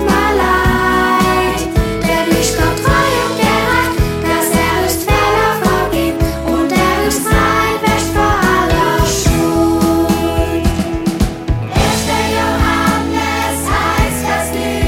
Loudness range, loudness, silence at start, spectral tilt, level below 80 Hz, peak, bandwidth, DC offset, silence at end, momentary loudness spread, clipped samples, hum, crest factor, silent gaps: 2 LU; -13 LUFS; 0 s; -4.5 dB/octave; -22 dBFS; 0 dBFS; 17 kHz; under 0.1%; 0 s; 4 LU; under 0.1%; none; 14 dB; none